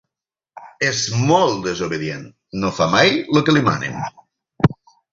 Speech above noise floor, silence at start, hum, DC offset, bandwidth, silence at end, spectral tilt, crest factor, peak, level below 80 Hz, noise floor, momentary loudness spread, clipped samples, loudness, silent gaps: 69 dB; 0.55 s; none; under 0.1%; 7.8 kHz; 0.4 s; -5 dB/octave; 18 dB; -2 dBFS; -48 dBFS; -87 dBFS; 13 LU; under 0.1%; -18 LUFS; none